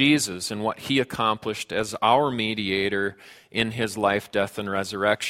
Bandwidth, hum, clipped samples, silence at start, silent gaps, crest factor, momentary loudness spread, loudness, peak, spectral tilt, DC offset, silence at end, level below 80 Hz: 16.5 kHz; none; under 0.1%; 0 s; none; 20 dB; 8 LU; -25 LUFS; -6 dBFS; -4 dB/octave; under 0.1%; 0 s; -58 dBFS